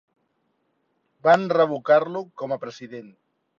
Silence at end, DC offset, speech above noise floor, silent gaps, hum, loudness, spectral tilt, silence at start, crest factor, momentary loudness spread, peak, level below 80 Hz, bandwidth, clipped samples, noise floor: 0.55 s; under 0.1%; 50 dB; none; none; -22 LUFS; -6.5 dB/octave; 1.25 s; 20 dB; 20 LU; -6 dBFS; -74 dBFS; 7.6 kHz; under 0.1%; -71 dBFS